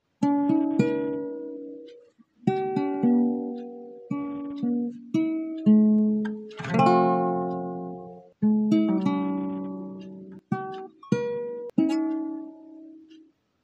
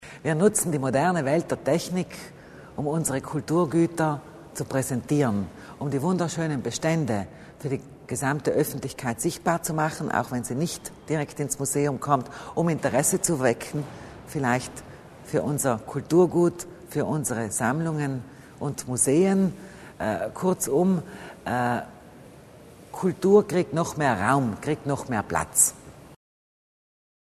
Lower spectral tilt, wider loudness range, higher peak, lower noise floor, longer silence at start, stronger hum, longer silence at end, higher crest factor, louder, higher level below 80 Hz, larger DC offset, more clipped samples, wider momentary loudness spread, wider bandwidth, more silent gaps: first, -8.5 dB/octave vs -5 dB/octave; first, 7 LU vs 3 LU; about the same, -6 dBFS vs -6 dBFS; first, -56 dBFS vs -48 dBFS; first, 0.2 s vs 0 s; neither; second, 0.65 s vs 1.2 s; about the same, 18 dB vs 20 dB; about the same, -26 LUFS vs -25 LUFS; second, -70 dBFS vs -56 dBFS; neither; neither; first, 19 LU vs 14 LU; second, 8 kHz vs 13.5 kHz; neither